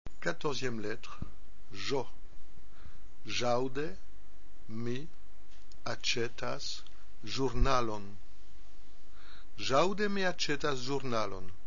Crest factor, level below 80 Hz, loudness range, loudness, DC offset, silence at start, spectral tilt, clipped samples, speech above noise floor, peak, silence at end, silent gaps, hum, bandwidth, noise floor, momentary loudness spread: 24 dB; -44 dBFS; 5 LU; -35 LUFS; 3%; 0.05 s; -3 dB/octave; under 0.1%; 21 dB; -12 dBFS; 0.05 s; none; none; 7.2 kHz; -55 dBFS; 19 LU